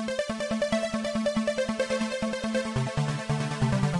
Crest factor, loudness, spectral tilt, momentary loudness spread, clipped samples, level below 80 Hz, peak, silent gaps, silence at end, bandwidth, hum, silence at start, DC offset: 14 dB; -29 LUFS; -5.5 dB/octave; 3 LU; under 0.1%; -50 dBFS; -14 dBFS; none; 0 s; 11.5 kHz; none; 0 s; under 0.1%